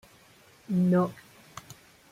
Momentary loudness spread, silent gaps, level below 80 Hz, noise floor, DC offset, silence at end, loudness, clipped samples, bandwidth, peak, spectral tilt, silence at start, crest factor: 25 LU; none; -68 dBFS; -57 dBFS; under 0.1%; 1 s; -27 LUFS; under 0.1%; 14.5 kHz; -14 dBFS; -8 dB/octave; 0.7 s; 16 dB